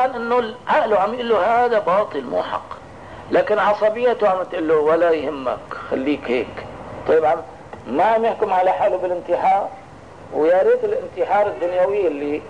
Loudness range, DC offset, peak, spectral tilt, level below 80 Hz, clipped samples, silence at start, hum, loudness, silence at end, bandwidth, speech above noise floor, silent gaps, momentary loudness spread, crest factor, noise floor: 2 LU; 0.3%; -8 dBFS; -6 dB/octave; -54 dBFS; under 0.1%; 0 s; none; -19 LUFS; 0 s; 10 kHz; 22 dB; none; 12 LU; 10 dB; -40 dBFS